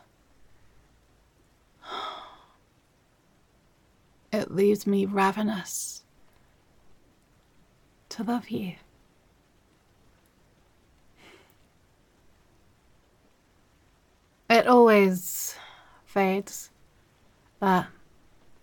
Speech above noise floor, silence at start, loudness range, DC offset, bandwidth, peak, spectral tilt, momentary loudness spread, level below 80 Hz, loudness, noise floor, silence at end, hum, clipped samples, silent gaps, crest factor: 41 dB; 1.85 s; 20 LU; under 0.1%; 17.5 kHz; -6 dBFS; -5 dB/octave; 25 LU; -66 dBFS; -25 LUFS; -64 dBFS; 0.75 s; none; under 0.1%; none; 22 dB